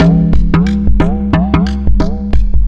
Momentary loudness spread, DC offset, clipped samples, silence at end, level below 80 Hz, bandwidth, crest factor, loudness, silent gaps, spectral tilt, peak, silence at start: 4 LU; under 0.1%; under 0.1%; 0 s; -14 dBFS; 7.2 kHz; 8 dB; -13 LUFS; none; -8.5 dB/octave; 0 dBFS; 0 s